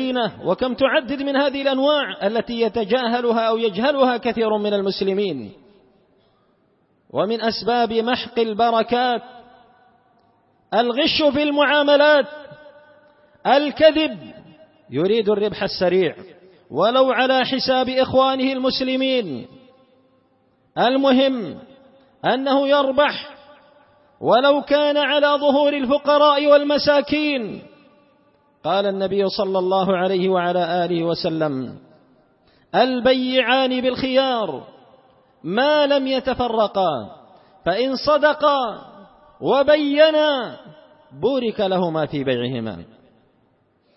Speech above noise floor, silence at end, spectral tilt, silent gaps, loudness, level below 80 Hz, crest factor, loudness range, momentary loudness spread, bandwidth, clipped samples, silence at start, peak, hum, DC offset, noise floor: 43 dB; 1.1 s; -8 dB/octave; none; -19 LUFS; -56 dBFS; 18 dB; 4 LU; 12 LU; 5.8 kHz; under 0.1%; 0 s; -2 dBFS; none; under 0.1%; -62 dBFS